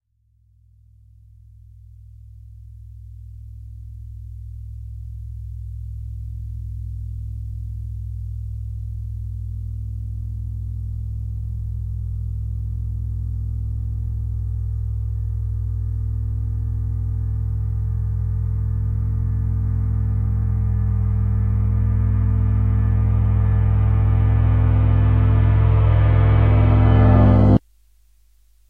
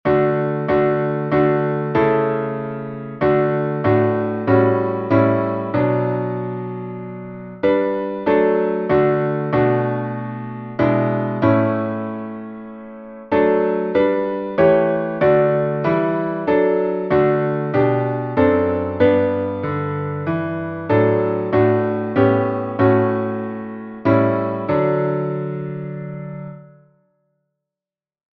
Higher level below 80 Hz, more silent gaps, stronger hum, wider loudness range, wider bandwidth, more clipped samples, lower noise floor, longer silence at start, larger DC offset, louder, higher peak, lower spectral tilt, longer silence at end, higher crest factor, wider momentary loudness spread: first, -24 dBFS vs -50 dBFS; neither; first, 50 Hz at -55 dBFS vs none; first, 19 LU vs 4 LU; second, 3.5 kHz vs 5.2 kHz; neither; second, -60 dBFS vs under -90 dBFS; first, 2.15 s vs 0.05 s; first, 0.1% vs under 0.1%; about the same, -21 LUFS vs -19 LUFS; about the same, -2 dBFS vs -2 dBFS; about the same, -11 dB/octave vs -10.5 dB/octave; second, 1.1 s vs 1.75 s; about the same, 18 dB vs 18 dB; first, 18 LU vs 12 LU